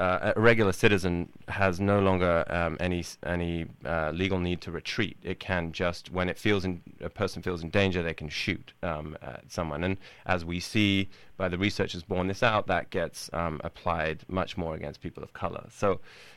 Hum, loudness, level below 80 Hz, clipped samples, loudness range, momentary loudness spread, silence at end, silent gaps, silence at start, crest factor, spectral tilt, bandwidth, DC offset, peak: none; -29 LUFS; -48 dBFS; under 0.1%; 4 LU; 12 LU; 0 s; none; 0 s; 24 dB; -5.5 dB/octave; 14 kHz; under 0.1%; -6 dBFS